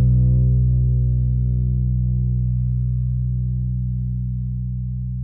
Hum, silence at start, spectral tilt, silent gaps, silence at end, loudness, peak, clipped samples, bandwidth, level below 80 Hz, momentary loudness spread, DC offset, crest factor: 60 Hz at -70 dBFS; 0 s; -16.5 dB/octave; none; 0 s; -21 LUFS; -10 dBFS; under 0.1%; 0.7 kHz; -24 dBFS; 9 LU; under 0.1%; 10 dB